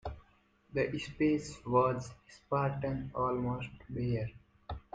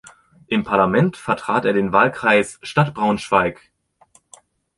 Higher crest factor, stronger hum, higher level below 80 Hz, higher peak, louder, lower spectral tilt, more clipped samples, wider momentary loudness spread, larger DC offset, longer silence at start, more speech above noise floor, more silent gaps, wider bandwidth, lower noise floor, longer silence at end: about the same, 20 dB vs 18 dB; neither; about the same, -54 dBFS vs -52 dBFS; second, -16 dBFS vs -2 dBFS; second, -34 LUFS vs -18 LUFS; about the same, -7 dB/octave vs -6 dB/octave; neither; first, 17 LU vs 7 LU; neither; second, 0.05 s vs 0.5 s; second, 34 dB vs 38 dB; neither; second, 9.2 kHz vs 11.5 kHz; first, -67 dBFS vs -56 dBFS; second, 0.15 s vs 1.25 s